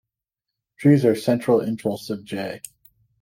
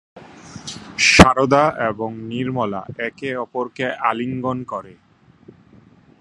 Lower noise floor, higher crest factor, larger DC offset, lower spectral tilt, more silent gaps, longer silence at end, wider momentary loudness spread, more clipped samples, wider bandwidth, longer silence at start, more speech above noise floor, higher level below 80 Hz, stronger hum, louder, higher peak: first, -85 dBFS vs -49 dBFS; about the same, 20 dB vs 20 dB; neither; first, -7 dB/octave vs -4.5 dB/octave; neither; second, 0.65 s vs 1.3 s; second, 15 LU vs 20 LU; neither; first, 16.5 kHz vs 14.5 kHz; first, 0.8 s vs 0.15 s; first, 65 dB vs 31 dB; second, -66 dBFS vs -38 dBFS; neither; second, -21 LUFS vs -18 LUFS; second, -4 dBFS vs 0 dBFS